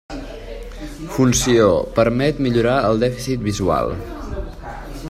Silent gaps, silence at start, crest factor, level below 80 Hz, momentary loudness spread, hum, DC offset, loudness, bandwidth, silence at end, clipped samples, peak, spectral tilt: none; 0.1 s; 18 dB; -34 dBFS; 19 LU; none; under 0.1%; -18 LUFS; 16 kHz; 0 s; under 0.1%; -2 dBFS; -5 dB/octave